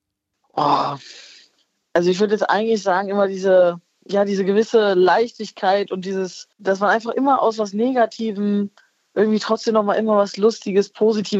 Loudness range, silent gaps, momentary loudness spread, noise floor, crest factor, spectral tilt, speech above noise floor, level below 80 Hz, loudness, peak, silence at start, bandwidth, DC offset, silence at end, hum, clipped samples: 3 LU; none; 10 LU; -72 dBFS; 16 dB; -5.5 dB/octave; 54 dB; -74 dBFS; -19 LUFS; -4 dBFS; 0.55 s; 8 kHz; under 0.1%; 0 s; none; under 0.1%